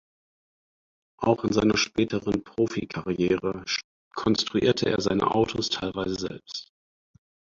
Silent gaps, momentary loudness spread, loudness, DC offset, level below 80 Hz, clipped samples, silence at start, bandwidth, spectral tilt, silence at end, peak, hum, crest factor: 3.84-4.11 s; 9 LU; -26 LUFS; under 0.1%; -54 dBFS; under 0.1%; 1.2 s; 7.6 kHz; -5 dB/octave; 0.95 s; -8 dBFS; none; 20 dB